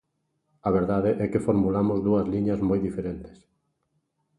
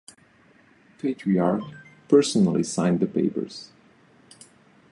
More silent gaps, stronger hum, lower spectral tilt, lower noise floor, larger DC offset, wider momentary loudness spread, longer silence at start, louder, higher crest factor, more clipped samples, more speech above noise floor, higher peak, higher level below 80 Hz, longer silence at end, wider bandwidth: neither; neither; first, -9.5 dB/octave vs -6 dB/octave; first, -75 dBFS vs -57 dBFS; neither; second, 9 LU vs 14 LU; second, 0.65 s vs 1.05 s; about the same, -25 LUFS vs -23 LUFS; about the same, 16 dB vs 20 dB; neither; first, 51 dB vs 35 dB; second, -10 dBFS vs -6 dBFS; first, -48 dBFS vs -64 dBFS; second, 1.05 s vs 1.3 s; about the same, 10.5 kHz vs 11.5 kHz